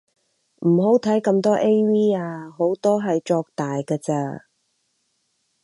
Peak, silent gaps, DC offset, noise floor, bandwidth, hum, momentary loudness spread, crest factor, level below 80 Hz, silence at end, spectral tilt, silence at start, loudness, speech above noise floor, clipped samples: -6 dBFS; none; under 0.1%; -70 dBFS; 11.5 kHz; none; 9 LU; 16 dB; -68 dBFS; 1.25 s; -7.5 dB/octave; 0.6 s; -21 LUFS; 50 dB; under 0.1%